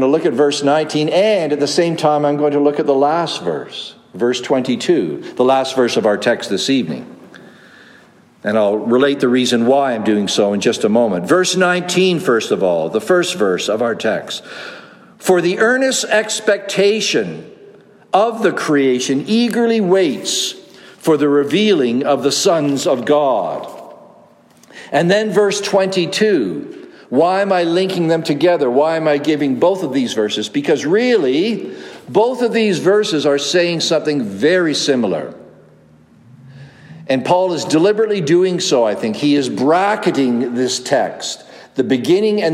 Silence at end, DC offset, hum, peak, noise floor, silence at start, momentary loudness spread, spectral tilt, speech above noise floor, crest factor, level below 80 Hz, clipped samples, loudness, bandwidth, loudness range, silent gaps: 0 s; under 0.1%; none; 0 dBFS; -47 dBFS; 0 s; 8 LU; -4.5 dB/octave; 32 dB; 16 dB; -66 dBFS; under 0.1%; -15 LUFS; 15 kHz; 3 LU; none